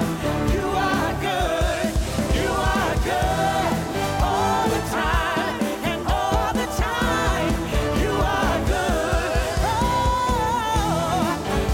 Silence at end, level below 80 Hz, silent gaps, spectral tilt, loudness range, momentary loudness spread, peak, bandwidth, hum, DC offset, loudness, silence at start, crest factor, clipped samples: 0 s; -28 dBFS; none; -5 dB/octave; 1 LU; 3 LU; -10 dBFS; 17 kHz; none; under 0.1%; -22 LUFS; 0 s; 12 dB; under 0.1%